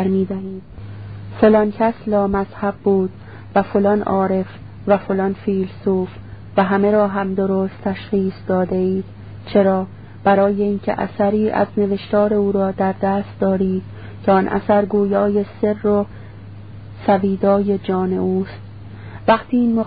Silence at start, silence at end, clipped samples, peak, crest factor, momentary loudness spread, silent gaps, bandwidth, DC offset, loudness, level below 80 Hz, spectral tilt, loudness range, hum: 0 s; 0 s; under 0.1%; 0 dBFS; 18 dB; 17 LU; none; 5 kHz; 0.5%; -18 LUFS; -46 dBFS; -12.5 dB/octave; 2 LU; none